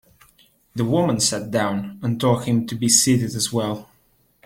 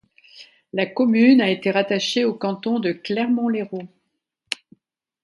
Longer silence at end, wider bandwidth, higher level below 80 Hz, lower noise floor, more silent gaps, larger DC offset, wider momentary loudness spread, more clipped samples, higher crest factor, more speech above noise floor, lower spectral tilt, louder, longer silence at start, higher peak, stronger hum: second, 0.6 s vs 1.4 s; first, 16.5 kHz vs 11.5 kHz; first, -54 dBFS vs -72 dBFS; second, -61 dBFS vs -75 dBFS; neither; neither; second, 11 LU vs 16 LU; neither; about the same, 20 dB vs 18 dB; second, 41 dB vs 56 dB; about the same, -4 dB/octave vs -5 dB/octave; about the same, -20 LUFS vs -20 LUFS; first, 0.75 s vs 0.35 s; about the same, -2 dBFS vs -4 dBFS; neither